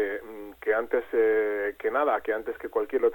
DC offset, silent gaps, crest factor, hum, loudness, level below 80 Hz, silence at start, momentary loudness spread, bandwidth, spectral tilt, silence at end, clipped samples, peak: under 0.1%; none; 14 dB; none; -27 LUFS; -62 dBFS; 0 s; 8 LU; 17.5 kHz; -5.5 dB/octave; 0 s; under 0.1%; -12 dBFS